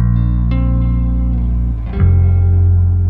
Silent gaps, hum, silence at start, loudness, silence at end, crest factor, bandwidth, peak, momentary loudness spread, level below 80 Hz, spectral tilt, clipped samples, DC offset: none; none; 0 s; -14 LUFS; 0 s; 10 dB; 3.7 kHz; -2 dBFS; 5 LU; -16 dBFS; -12 dB/octave; under 0.1%; under 0.1%